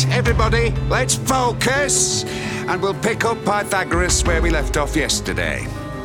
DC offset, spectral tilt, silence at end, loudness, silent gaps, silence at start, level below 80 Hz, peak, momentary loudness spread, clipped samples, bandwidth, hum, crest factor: under 0.1%; -3.5 dB/octave; 0 s; -18 LUFS; none; 0 s; -26 dBFS; -4 dBFS; 6 LU; under 0.1%; 18.5 kHz; none; 16 dB